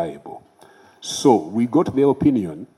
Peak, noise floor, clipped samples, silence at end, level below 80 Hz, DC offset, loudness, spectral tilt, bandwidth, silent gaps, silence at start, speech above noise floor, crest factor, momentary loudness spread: -2 dBFS; -50 dBFS; under 0.1%; 0.1 s; -54 dBFS; under 0.1%; -19 LUFS; -6 dB/octave; 13.5 kHz; none; 0 s; 31 dB; 18 dB; 18 LU